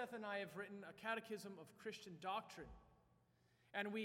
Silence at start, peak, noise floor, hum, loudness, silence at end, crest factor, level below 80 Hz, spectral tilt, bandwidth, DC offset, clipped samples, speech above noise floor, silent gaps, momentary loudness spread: 0 s; -28 dBFS; -78 dBFS; none; -50 LUFS; 0 s; 22 dB; -76 dBFS; -4.5 dB/octave; 17.5 kHz; under 0.1%; under 0.1%; 28 dB; none; 11 LU